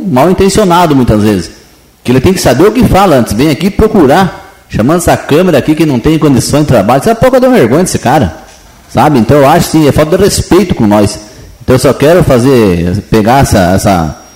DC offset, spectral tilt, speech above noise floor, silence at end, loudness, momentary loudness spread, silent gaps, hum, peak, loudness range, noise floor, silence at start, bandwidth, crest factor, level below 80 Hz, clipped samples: under 0.1%; -6 dB/octave; 33 dB; 0.15 s; -7 LUFS; 6 LU; none; none; 0 dBFS; 1 LU; -39 dBFS; 0 s; 16.5 kHz; 6 dB; -26 dBFS; 2%